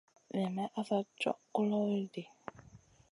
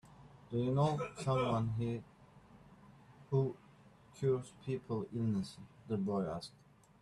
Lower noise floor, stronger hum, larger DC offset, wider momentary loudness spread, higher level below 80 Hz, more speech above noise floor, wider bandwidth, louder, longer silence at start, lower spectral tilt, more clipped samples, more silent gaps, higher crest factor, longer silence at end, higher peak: about the same, -60 dBFS vs -62 dBFS; neither; neither; first, 16 LU vs 12 LU; second, -76 dBFS vs -66 dBFS; about the same, 25 dB vs 26 dB; about the same, 11 kHz vs 11.5 kHz; about the same, -36 LUFS vs -37 LUFS; first, 0.35 s vs 0.05 s; about the same, -7 dB/octave vs -7.5 dB/octave; neither; neither; about the same, 18 dB vs 18 dB; second, 0.35 s vs 0.55 s; about the same, -20 dBFS vs -20 dBFS